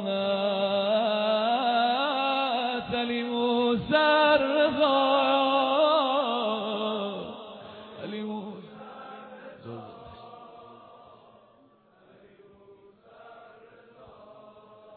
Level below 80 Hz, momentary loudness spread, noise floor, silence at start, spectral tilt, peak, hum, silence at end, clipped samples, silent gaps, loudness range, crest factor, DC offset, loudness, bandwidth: -66 dBFS; 22 LU; -60 dBFS; 0 s; -7.5 dB/octave; -10 dBFS; none; 0 s; under 0.1%; none; 22 LU; 18 dB; under 0.1%; -25 LUFS; 4.6 kHz